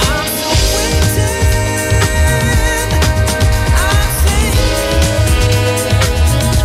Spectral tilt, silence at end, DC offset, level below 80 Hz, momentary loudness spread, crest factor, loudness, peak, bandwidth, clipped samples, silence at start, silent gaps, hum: -4 dB/octave; 0 s; under 0.1%; -16 dBFS; 2 LU; 10 dB; -13 LUFS; -2 dBFS; 16 kHz; under 0.1%; 0 s; none; none